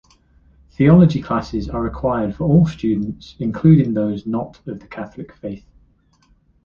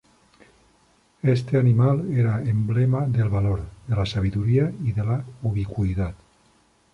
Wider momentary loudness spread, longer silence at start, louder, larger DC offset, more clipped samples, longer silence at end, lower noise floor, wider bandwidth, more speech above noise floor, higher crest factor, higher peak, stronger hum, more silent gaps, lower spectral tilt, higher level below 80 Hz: first, 19 LU vs 7 LU; second, 0.8 s vs 1.25 s; first, -17 LUFS vs -23 LUFS; neither; neither; first, 1.05 s vs 0.8 s; second, -57 dBFS vs -61 dBFS; about the same, 7 kHz vs 7 kHz; about the same, 40 dB vs 39 dB; about the same, 16 dB vs 14 dB; first, -2 dBFS vs -8 dBFS; neither; neither; about the same, -9.5 dB/octave vs -9 dB/octave; about the same, -40 dBFS vs -42 dBFS